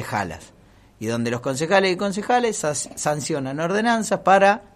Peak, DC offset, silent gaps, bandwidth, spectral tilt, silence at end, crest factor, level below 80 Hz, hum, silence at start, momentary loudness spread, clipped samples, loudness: -2 dBFS; under 0.1%; none; 14.5 kHz; -4 dB/octave; 0.15 s; 18 dB; -58 dBFS; none; 0 s; 11 LU; under 0.1%; -21 LUFS